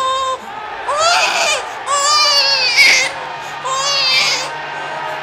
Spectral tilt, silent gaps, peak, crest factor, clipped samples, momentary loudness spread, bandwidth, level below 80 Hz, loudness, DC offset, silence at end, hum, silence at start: 1 dB/octave; none; 0 dBFS; 16 dB; under 0.1%; 15 LU; 16 kHz; -56 dBFS; -13 LUFS; under 0.1%; 0 s; none; 0 s